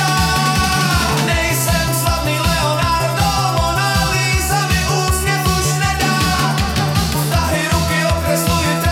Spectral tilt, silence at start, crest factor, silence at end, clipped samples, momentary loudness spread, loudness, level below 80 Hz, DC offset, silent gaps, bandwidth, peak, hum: -4 dB/octave; 0 s; 14 dB; 0 s; under 0.1%; 2 LU; -15 LUFS; -26 dBFS; under 0.1%; none; 17.5 kHz; -2 dBFS; none